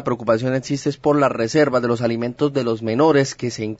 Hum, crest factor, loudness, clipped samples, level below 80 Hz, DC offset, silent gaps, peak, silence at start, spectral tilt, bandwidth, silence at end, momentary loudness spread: none; 16 dB; -19 LUFS; under 0.1%; -56 dBFS; under 0.1%; none; -4 dBFS; 0 s; -6 dB/octave; 8 kHz; 0.05 s; 6 LU